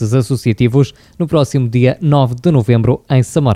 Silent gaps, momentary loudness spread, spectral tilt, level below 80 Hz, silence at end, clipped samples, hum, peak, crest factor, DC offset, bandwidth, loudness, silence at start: none; 4 LU; -7.5 dB/octave; -42 dBFS; 0 s; under 0.1%; none; 0 dBFS; 12 dB; under 0.1%; 13 kHz; -14 LUFS; 0 s